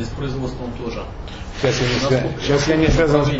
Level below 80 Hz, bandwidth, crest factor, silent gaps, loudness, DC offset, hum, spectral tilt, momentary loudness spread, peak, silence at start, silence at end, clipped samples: -30 dBFS; 8 kHz; 16 dB; none; -19 LUFS; under 0.1%; none; -5.5 dB/octave; 15 LU; -4 dBFS; 0 s; 0 s; under 0.1%